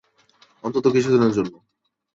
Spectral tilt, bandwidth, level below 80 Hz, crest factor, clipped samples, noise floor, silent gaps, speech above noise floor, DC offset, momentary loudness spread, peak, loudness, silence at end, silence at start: -7 dB/octave; 7.8 kHz; -60 dBFS; 16 dB; under 0.1%; -58 dBFS; none; 39 dB; under 0.1%; 13 LU; -6 dBFS; -20 LUFS; 0.65 s; 0.65 s